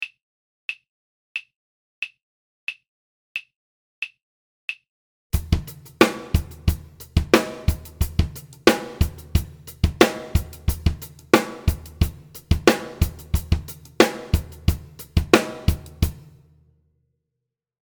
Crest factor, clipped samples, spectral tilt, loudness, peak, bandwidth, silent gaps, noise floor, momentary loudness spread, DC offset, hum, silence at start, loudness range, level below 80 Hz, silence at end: 24 dB; under 0.1%; -5.5 dB/octave; -24 LUFS; 0 dBFS; over 20 kHz; 0.23-0.69 s, 0.89-1.35 s, 1.56-2.02 s, 2.23-2.67 s, 2.89-3.35 s, 3.56-4.02 s, 4.23-4.68 s, 4.89-5.30 s; -83 dBFS; 14 LU; under 0.1%; none; 0 s; 13 LU; -30 dBFS; 1.7 s